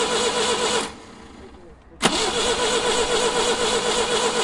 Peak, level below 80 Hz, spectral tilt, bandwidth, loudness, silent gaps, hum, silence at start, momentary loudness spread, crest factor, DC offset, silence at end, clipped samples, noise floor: -2 dBFS; -44 dBFS; -1.5 dB/octave; 11.5 kHz; -20 LUFS; none; none; 0 s; 3 LU; 20 dB; under 0.1%; 0 s; under 0.1%; -45 dBFS